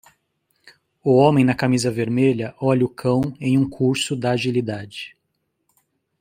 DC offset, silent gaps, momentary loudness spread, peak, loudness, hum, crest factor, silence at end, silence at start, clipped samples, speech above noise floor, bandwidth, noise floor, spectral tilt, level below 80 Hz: under 0.1%; none; 12 LU; -2 dBFS; -20 LUFS; none; 18 dB; 1.1 s; 1.05 s; under 0.1%; 54 dB; 15.5 kHz; -73 dBFS; -6.5 dB/octave; -56 dBFS